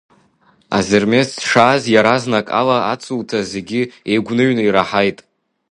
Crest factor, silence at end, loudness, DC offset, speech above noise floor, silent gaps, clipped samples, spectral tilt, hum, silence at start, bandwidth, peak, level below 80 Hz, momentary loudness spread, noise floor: 16 dB; 0.55 s; -15 LUFS; under 0.1%; 40 dB; none; under 0.1%; -5 dB/octave; none; 0.7 s; 11.5 kHz; 0 dBFS; -52 dBFS; 9 LU; -55 dBFS